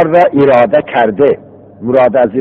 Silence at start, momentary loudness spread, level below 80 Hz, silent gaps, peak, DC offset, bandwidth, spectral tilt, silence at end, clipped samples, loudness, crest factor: 0 s; 7 LU; -48 dBFS; none; 0 dBFS; under 0.1%; 5.4 kHz; -8.5 dB/octave; 0 s; 0.4%; -10 LUFS; 10 dB